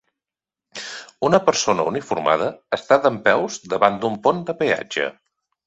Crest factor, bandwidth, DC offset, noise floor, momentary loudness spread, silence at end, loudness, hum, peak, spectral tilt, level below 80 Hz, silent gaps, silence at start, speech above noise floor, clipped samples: 20 dB; 8.2 kHz; under 0.1%; -89 dBFS; 13 LU; 0.55 s; -20 LUFS; none; 0 dBFS; -4 dB/octave; -62 dBFS; none; 0.75 s; 69 dB; under 0.1%